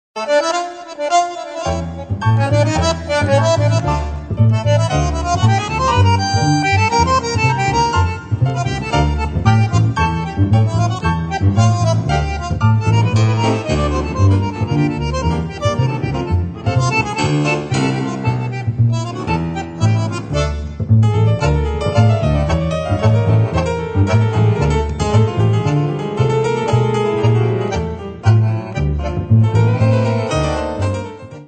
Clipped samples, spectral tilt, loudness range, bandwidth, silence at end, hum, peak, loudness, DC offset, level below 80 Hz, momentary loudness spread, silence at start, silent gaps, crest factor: under 0.1%; -6.5 dB/octave; 3 LU; 9 kHz; 0 s; none; 0 dBFS; -16 LUFS; under 0.1%; -30 dBFS; 6 LU; 0.15 s; none; 14 dB